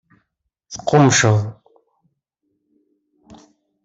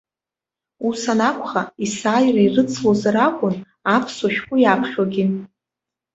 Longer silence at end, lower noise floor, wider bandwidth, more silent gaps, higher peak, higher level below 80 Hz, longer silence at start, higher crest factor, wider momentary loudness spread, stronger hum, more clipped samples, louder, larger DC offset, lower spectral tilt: first, 2.3 s vs 0.7 s; second, -74 dBFS vs -89 dBFS; about the same, 8 kHz vs 8 kHz; neither; about the same, -2 dBFS vs -2 dBFS; about the same, -56 dBFS vs -60 dBFS; about the same, 0.7 s vs 0.8 s; about the same, 20 dB vs 18 dB; first, 18 LU vs 8 LU; neither; neither; first, -15 LUFS vs -19 LUFS; neither; about the same, -4.5 dB/octave vs -5.5 dB/octave